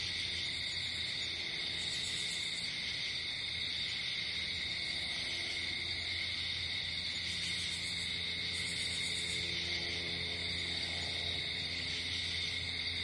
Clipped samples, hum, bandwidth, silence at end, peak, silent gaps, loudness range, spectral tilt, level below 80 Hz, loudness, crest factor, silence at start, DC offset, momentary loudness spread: under 0.1%; none; 11.5 kHz; 0 s; -24 dBFS; none; 1 LU; -1.5 dB/octave; -62 dBFS; -35 LUFS; 14 dB; 0 s; under 0.1%; 1 LU